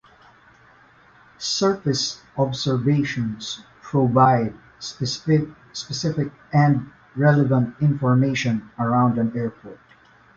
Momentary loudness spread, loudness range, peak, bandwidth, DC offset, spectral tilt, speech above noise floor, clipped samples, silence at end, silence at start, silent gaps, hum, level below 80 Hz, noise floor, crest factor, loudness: 13 LU; 4 LU; -2 dBFS; 7.8 kHz; under 0.1%; -6 dB/octave; 32 dB; under 0.1%; 0.6 s; 1.4 s; none; none; -56 dBFS; -53 dBFS; 20 dB; -21 LUFS